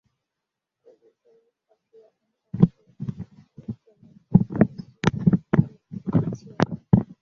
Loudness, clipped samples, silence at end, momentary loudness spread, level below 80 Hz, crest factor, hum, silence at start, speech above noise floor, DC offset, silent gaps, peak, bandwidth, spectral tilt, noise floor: -24 LUFS; under 0.1%; 0.15 s; 18 LU; -48 dBFS; 24 dB; none; 2.55 s; 26 dB; under 0.1%; none; -2 dBFS; 7 kHz; -8.5 dB/octave; -85 dBFS